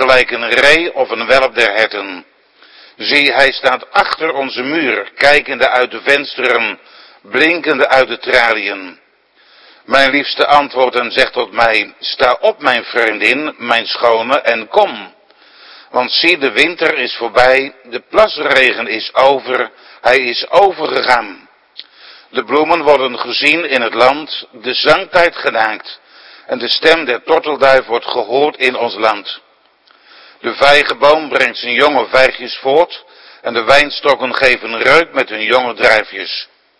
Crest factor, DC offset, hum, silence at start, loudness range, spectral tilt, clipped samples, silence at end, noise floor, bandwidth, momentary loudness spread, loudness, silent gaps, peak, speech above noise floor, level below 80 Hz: 14 dB; under 0.1%; none; 0 s; 2 LU; -3 dB/octave; 0.7%; 0.35 s; -50 dBFS; 11 kHz; 10 LU; -12 LUFS; none; 0 dBFS; 38 dB; -46 dBFS